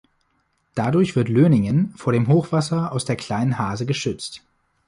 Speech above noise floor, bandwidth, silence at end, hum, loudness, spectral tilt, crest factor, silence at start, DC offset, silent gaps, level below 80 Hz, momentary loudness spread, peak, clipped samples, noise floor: 48 dB; 11.5 kHz; 0.5 s; none; -21 LUFS; -7 dB/octave; 16 dB; 0.75 s; under 0.1%; none; -52 dBFS; 11 LU; -4 dBFS; under 0.1%; -68 dBFS